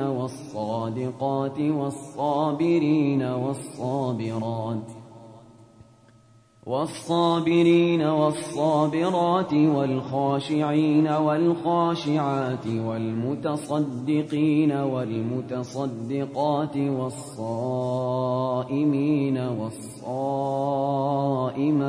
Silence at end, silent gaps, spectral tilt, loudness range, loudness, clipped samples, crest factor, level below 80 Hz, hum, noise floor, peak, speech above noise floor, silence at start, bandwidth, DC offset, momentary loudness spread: 0 s; none; -7.5 dB/octave; 6 LU; -25 LUFS; under 0.1%; 16 dB; -66 dBFS; none; -56 dBFS; -8 dBFS; 32 dB; 0 s; 11 kHz; under 0.1%; 9 LU